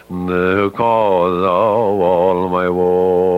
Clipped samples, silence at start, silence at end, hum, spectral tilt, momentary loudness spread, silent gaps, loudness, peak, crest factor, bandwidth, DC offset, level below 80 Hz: under 0.1%; 0.1 s; 0 s; none; -8 dB/octave; 3 LU; none; -15 LUFS; -2 dBFS; 12 dB; 5.4 kHz; under 0.1%; -50 dBFS